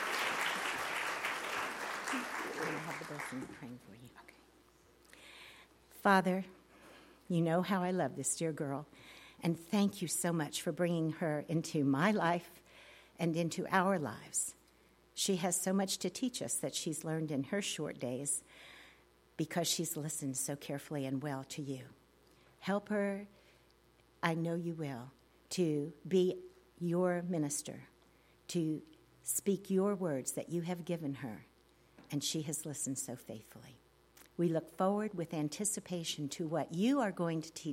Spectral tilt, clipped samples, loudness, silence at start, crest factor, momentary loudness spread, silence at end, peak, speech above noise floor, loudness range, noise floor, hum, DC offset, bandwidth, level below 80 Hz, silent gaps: -4.5 dB/octave; under 0.1%; -36 LUFS; 0 s; 24 dB; 18 LU; 0 s; -14 dBFS; 31 dB; 6 LU; -67 dBFS; none; under 0.1%; 16.5 kHz; -74 dBFS; none